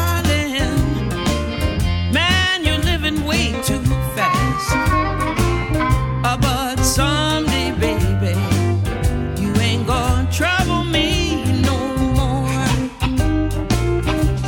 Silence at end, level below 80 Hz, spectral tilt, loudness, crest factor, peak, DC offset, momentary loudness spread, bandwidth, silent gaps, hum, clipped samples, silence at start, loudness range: 0 s; -26 dBFS; -5 dB/octave; -18 LUFS; 16 dB; -2 dBFS; under 0.1%; 4 LU; 17.5 kHz; none; none; under 0.1%; 0 s; 1 LU